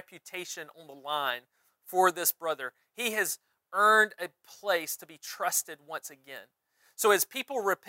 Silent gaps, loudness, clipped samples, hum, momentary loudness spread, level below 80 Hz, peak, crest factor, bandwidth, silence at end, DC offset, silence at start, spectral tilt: none; -29 LUFS; under 0.1%; none; 18 LU; under -90 dBFS; -10 dBFS; 22 dB; 16 kHz; 0.15 s; under 0.1%; 0.1 s; -1 dB/octave